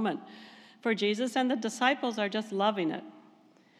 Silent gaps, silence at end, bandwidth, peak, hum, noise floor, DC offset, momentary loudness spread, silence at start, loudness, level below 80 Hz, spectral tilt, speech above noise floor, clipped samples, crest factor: none; 0.6 s; 13 kHz; -10 dBFS; none; -61 dBFS; under 0.1%; 13 LU; 0 s; -30 LUFS; under -90 dBFS; -4 dB/octave; 31 dB; under 0.1%; 22 dB